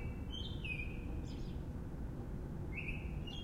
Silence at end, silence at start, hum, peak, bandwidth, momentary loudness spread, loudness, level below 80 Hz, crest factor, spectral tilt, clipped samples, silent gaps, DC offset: 0 s; 0 s; none; -30 dBFS; 15.5 kHz; 4 LU; -44 LUFS; -46 dBFS; 12 dB; -6.5 dB/octave; under 0.1%; none; under 0.1%